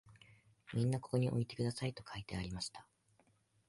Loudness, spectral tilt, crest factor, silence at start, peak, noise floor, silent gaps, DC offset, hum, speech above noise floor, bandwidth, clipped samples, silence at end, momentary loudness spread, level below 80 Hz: -40 LUFS; -6 dB/octave; 18 dB; 0.05 s; -22 dBFS; -74 dBFS; none; under 0.1%; none; 35 dB; 11.5 kHz; under 0.1%; 0.85 s; 10 LU; -62 dBFS